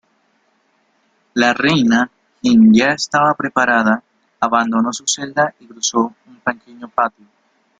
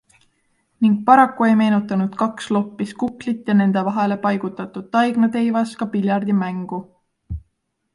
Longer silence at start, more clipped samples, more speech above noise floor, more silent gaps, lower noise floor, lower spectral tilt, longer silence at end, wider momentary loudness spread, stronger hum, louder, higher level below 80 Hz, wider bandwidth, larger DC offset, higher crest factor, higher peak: first, 1.35 s vs 0.8 s; neither; second, 46 dB vs 53 dB; neither; second, -61 dBFS vs -71 dBFS; second, -4 dB/octave vs -7.5 dB/octave; first, 0.7 s vs 0.55 s; second, 12 LU vs 15 LU; neither; first, -16 LUFS vs -19 LUFS; second, -56 dBFS vs -48 dBFS; second, 9.4 kHz vs 11 kHz; neither; about the same, 16 dB vs 18 dB; about the same, 0 dBFS vs 0 dBFS